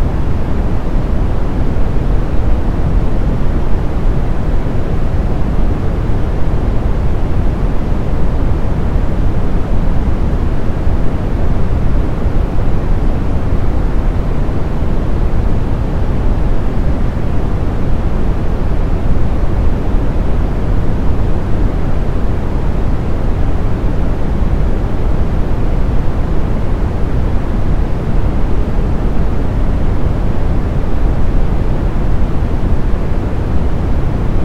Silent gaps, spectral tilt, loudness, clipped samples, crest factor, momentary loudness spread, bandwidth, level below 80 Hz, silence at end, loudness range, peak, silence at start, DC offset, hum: none; -9 dB/octave; -17 LUFS; under 0.1%; 10 dB; 1 LU; 5.6 kHz; -14 dBFS; 0 s; 0 LU; 0 dBFS; 0 s; under 0.1%; none